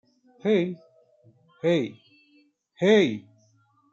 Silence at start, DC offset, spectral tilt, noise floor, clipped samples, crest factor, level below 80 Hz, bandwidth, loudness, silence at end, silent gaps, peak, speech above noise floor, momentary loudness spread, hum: 0.45 s; under 0.1%; -6.5 dB/octave; -64 dBFS; under 0.1%; 18 dB; -74 dBFS; 7.6 kHz; -24 LUFS; 0.7 s; none; -8 dBFS; 41 dB; 16 LU; none